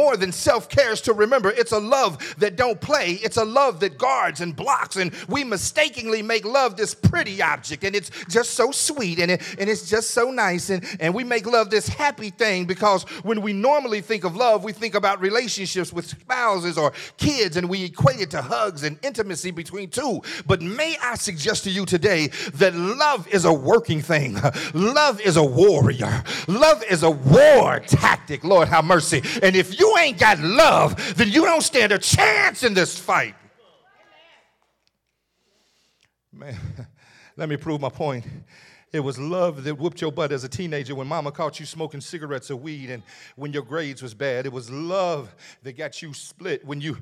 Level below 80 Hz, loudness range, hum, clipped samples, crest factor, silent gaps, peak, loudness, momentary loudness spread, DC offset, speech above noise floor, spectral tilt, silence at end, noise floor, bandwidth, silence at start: -52 dBFS; 13 LU; none; under 0.1%; 16 dB; none; -4 dBFS; -20 LUFS; 15 LU; under 0.1%; 54 dB; -4 dB/octave; 0.05 s; -74 dBFS; 17.5 kHz; 0 s